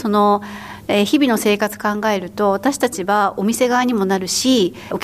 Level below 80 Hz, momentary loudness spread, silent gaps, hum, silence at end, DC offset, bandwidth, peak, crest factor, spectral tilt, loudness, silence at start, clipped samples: -54 dBFS; 5 LU; none; none; 0 s; under 0.1%; 15.5 kHz; -4 dBFS; 12 dB; -4 dB/octave; -17 LUFS; 0 s; under 0.1%